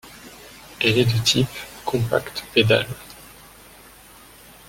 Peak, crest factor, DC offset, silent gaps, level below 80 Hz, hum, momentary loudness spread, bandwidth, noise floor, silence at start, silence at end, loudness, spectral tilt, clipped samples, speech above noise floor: -2 dBFS; 22 dB; under 0.1%; none; -50 dBFS; none; 24 LU; 17 kHz; -47 dBFS; 0.05 s; 1.45 s; -20 LUFS; -4.5 dB/octave; under 0.1%; 26 dB